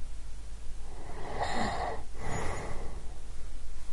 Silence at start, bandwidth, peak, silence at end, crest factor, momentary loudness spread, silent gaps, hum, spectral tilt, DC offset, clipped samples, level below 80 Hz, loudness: 0 s; 11 kHz; -16 dBFS; 0 s; 12 dB; 14 LU; none; none; -4.5 dB/octave; under 0.1%; under 0.1%; -38 dBFS; -39 LUFS